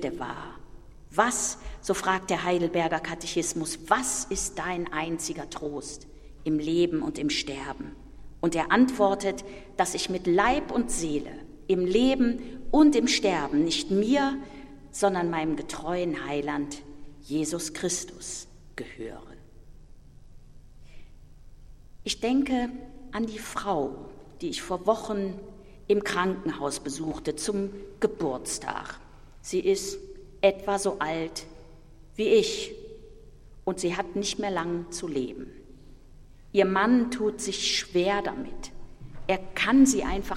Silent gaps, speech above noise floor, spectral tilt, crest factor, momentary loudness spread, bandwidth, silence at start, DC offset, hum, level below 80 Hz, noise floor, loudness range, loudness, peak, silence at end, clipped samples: none; 22 dB; -4 dB/octave; 22 dB; 18 LU; 15.5 kHz; 0 s; under 0.1%; none; -48 dBFS; -49 dBFS; 8 LU; -27 LUFS; -6 dBFS; 0 s; under 0.1%